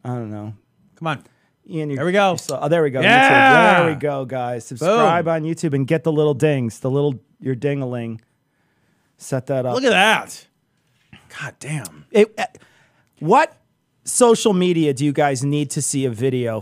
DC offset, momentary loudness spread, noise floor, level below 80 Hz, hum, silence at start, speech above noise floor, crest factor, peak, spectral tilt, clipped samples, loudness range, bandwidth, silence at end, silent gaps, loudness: under 0.1%; 17 LU; -65 dBFS; -68 dBFS; none; 0.05 s; 47 dB; 18 dB; 0 dBFS; -4.5 dB/octave; under 0.1%; 7 LU; 15.5 kHz; 0 s; none; -18 LUFS